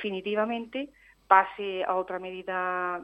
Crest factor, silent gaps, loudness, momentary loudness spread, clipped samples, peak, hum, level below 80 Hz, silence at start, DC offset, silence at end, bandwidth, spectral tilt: 24 dB; none; -28 LUFS; 14 LU; under 0.1%; -4 dBFS; none; -68 dBFS; 0 s; under 0.1%; 0 s; 8.4 kHz; -6.5 dB/octave